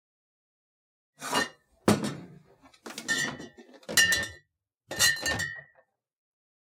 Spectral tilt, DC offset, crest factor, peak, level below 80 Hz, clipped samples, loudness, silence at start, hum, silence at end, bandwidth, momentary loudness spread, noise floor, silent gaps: -2 dB/octave; under 0.1%; 26 dB; -6 dBFS; -62 dBFS; under 0.1%; -27 LUFS; 1.2 s; none; 1 s; 17 kHz; 21 LU; -72 dBFS; none